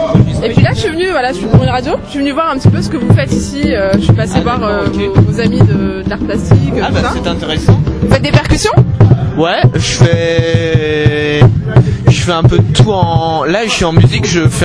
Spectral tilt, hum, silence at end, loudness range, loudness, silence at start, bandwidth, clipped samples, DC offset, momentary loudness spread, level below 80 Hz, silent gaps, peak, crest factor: -6 dB/octave; none; 0 s; 2 LU; -11 LUFS; 0 s; 11 kHz; 1%; under 0.1%; 5 LU; -24 dBFS; none; 0 dBFS; 10 dB